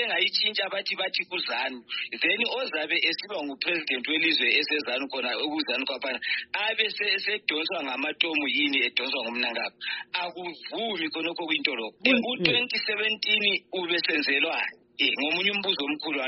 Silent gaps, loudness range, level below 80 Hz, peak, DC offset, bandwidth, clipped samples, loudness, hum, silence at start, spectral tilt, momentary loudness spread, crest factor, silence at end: none; 3 LU; -76 dBFS; -6 dBFS; under 0.1%; 6 kHz; under 0.1%; -26 LUFS; none; 0 s; 0.5 dB/octave; 8 LU; 22 dB; 0 s